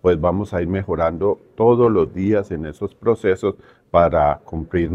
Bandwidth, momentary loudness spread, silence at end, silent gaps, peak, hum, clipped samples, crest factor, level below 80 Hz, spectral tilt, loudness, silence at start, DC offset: 8.4 kHz; 11 LU; 0 s; none; 0 dBFS; none; under 0.1%; 18 dB; -40 dBFS; -9 dB/octave; -19 LUFS; 0.05 s; under 0.1%